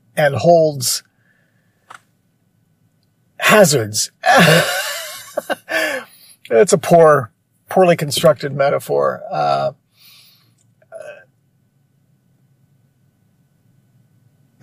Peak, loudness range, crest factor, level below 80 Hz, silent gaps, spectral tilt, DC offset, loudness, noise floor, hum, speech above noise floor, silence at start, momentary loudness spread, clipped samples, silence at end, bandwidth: 0 dBFS; 8 LU; 18 dB; -62 dBFS; none; -4 dB/octave; under 0.1%; -15 LUFS; -61 dBFS; none; 47 dB; 0.15 s; 16 LU; under 0.1%; 3.5 s; 15.5 kHz